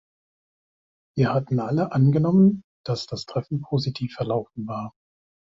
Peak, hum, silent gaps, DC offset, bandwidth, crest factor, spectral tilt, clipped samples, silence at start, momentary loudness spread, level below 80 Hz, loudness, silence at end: -8 dBFS; none; 2.64-2.84 s; under 0.1%; 7.6 kHz; 16 dB; -8 dB/octave; under 0.1%; 1.15 s; 14 LU; -58 dBFS; -24 LUFS; 0.7 s